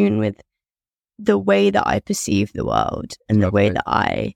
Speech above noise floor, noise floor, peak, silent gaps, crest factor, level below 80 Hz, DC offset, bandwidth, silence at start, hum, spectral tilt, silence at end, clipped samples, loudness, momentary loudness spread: over 71 dB; under -90 dBFS; -2 dBFS; none; 18 dB; -44 dBFS; under 0.1%; 15.5 kHz; 0 s; none; -5.5 dB/octave; 0.05 s; under 0.1%; -19 LUFS; 8 LU